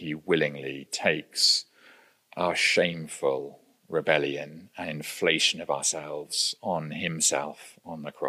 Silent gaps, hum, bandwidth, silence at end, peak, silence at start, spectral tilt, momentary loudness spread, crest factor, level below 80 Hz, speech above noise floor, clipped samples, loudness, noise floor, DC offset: none; none; 15.5 kHz; 0 s; -6 dBFS; 0 s; -2 dB/octave; 16 LU; 24 dB; -72 dBFS; 29 dB; under 0.1%; -26 LUFS; -57 dBFS; under 0.1%